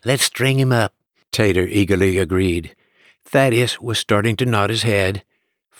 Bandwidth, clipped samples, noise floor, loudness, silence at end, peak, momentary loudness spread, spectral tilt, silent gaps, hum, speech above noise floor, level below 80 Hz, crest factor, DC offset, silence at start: 19.5 kHz; under 0.1%; -59 dBFS; -18 LUFS; 0.6 s; -4 dBFS; 6 LU; -5 dB/octave; none; none; 42 dB; -46 dBFS; 14 dB; under 0.1%; 0.05 s